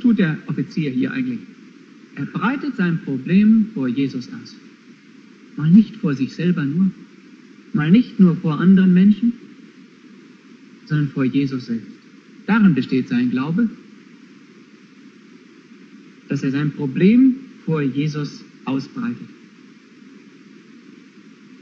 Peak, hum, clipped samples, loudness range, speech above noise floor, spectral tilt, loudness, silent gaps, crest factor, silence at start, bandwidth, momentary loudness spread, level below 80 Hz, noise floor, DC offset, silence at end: -2 dBFS; none; under 0.1%; 9 LU; 29 dB; -8.5 dB/octave; -19 LUFS; none; 18 dB; 0 s; 6.6 kHz; 15 LU; -60 dBFS; -46 dBFS; under 0.1%; 2.3 s